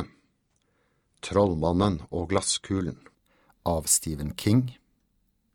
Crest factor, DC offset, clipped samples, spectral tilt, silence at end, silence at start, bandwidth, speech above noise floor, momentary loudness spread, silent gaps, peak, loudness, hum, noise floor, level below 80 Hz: 22 dB; under 0.1%; under 0.1%; -4.5 dB/octave; 0.8 s; 0 s; 18.5 kHz; 46 dB; 13 LU; none; -8 dBFS; -26 LUFS; none; -71 dBFS; -48 dBFS